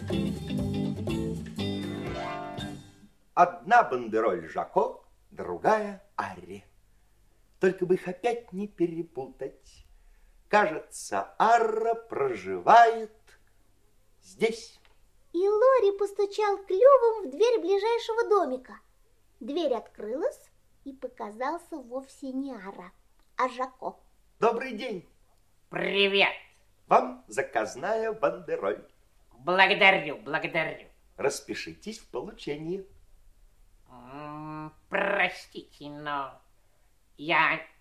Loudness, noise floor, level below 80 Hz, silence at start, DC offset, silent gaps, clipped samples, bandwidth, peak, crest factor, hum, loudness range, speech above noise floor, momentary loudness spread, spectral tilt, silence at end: -27 LUFS; -65 dBFS; -56 dBFS; 0 s; under 0.1%; none; under 0.1%; 13.5 kHz; -4 dBFS; 24 dB; none; 10 LU; 38 dB; 19 LU; -4.5 dB/octave; 0.15 s